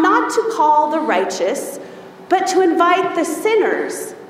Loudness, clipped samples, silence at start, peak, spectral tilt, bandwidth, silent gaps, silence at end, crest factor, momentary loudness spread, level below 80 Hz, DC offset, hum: -16 LUFS; under 0.1%; 0 s; -2 dBFS; -3 dB/octave; 16 kHz; none; 0 s; 16 dB; 11 LU; -68 dBFS; under 0.1%; none